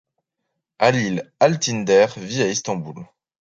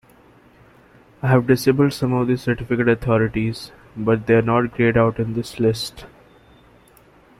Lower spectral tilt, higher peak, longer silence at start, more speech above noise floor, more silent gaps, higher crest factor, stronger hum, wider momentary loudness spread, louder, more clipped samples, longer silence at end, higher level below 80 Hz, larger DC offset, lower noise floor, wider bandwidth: second, -4.5 dB/octave vs -7 dB/octave; about the same, -2 dBFS vs -4 dBFS; second, 0.8 s vs 1.25 s; first, 59 dB vs 33 dB; neither; about the same, 20 dB vs 18 dB; neither; about the same, 12 LU vs 10 LU; about the same, -20 LUFS vs -19 LUFS; neither; second, 0.35 s vs 1.35 s; second, -60 dBFS vs -46 dBFS; neither; first, -78 dBFS vs -51 dBFS; second, 7.8 kHz vs 14.5 kHz